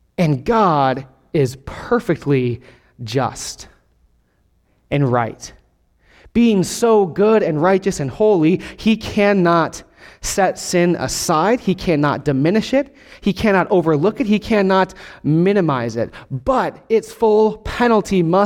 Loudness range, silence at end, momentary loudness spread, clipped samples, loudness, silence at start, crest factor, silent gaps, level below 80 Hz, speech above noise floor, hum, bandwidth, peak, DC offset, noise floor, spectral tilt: 7 LU; 0 s; 10 LU; under 0.1%; -17 LUFS; 0.2 s; 16 dB; none; -42 dBFS; 44 dB; none; 16.5 kHz; -2 dBFS; under 0.1%; -60 dBFS; -6 dB/octave